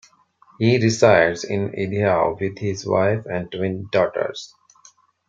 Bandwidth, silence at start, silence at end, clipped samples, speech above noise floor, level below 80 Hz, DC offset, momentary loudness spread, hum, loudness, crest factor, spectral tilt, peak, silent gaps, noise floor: 8.6 kHz; 0.6 s; 0.85 s; under 0.1%; 35 dB; -58 dBFS; under 0.1%; 12 LU; none; -20 LUFS; 18 dB; -6 dB/octave; -2 dBFS; none; -55 dBFS